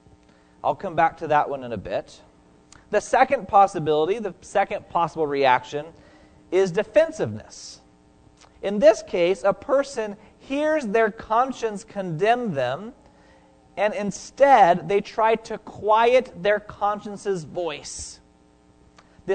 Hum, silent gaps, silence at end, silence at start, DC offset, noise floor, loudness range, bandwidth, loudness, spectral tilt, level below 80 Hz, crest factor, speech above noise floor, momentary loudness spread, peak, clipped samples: none; none; 0 s; 0.65 s; under 0.1%; -56 dBFS; 5 LU; 9.4 kHz; -22 LUFS; -5 dB/octave; -56 dBFS; 20 dB; 34 dB; 15 LU; -2 dBFS; under 0.1%